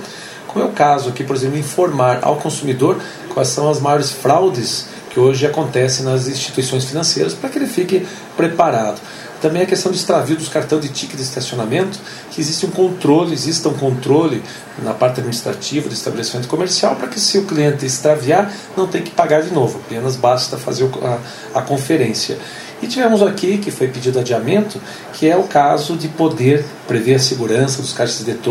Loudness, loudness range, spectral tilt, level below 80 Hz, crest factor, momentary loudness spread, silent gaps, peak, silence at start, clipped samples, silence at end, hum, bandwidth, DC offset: -16 LUFS; 3 LU; -4.5 dB/octave; -58 dBFS; 16 dB; 9 LU; none; 0 dBFS; 0 s; under 0.1%; 0 s; none; 16 kHz; under 0.1%